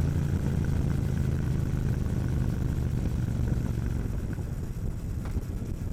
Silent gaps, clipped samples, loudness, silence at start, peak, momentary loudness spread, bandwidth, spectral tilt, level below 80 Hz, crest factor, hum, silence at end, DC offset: none; under 0.1%; -30 LUFS; 0 s; -14 dBFS; 6 LU; 15.5 kHz; -8 dB/octave; -34 dBFS; 14 dB; none; 0 s; under 0.1%